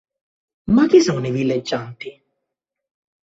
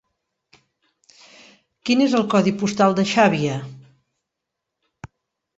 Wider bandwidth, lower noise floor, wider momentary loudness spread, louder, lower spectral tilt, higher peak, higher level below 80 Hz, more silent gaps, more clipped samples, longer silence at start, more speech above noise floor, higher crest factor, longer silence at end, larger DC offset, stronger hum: about the same, 8 kHz vs 8 kHz; about the same, -81 dBFS vs -82 dBFS; first, 22 LU vs 14 LU; about the same, -17 LUFS vs -19 LUFS; about the same, -6 dB/octave vs -5.5 dB/octave; about the same, -2 dBFS vs -2 dBFS; first, -52 dBFS vs -60 dBFS; neither; neither; second, 0.65 s vs 1.85 s; about the same, 64 dB vs 64 dB; about the same, 18 dB vs 20 dB; first, 1.1 s vs 0.5 s; neither; neither